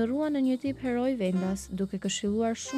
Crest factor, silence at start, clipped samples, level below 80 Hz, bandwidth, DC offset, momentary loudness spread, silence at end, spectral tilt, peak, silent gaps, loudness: 12 dB; 0 s; under 0.1%; -56 dBFS; 13.5 kHz; under 0.1%; 5 LU; 0 s; -5.5 dB/octave; -16 dBFS; none; -29 LUFS